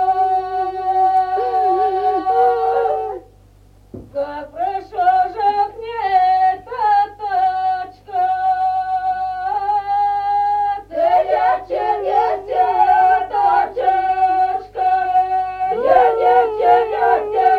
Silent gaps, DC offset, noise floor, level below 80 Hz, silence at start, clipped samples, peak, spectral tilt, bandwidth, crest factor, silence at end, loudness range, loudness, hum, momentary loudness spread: none; under 0.1%; -47 dBFS; -50 dBFS; 0 s; under 0.1%; -2 dBFS; -5.5 dB/octave; 5.2 kHz; 16 dB; 0 s; 4 LU; -17 LUFS; none; 8 LU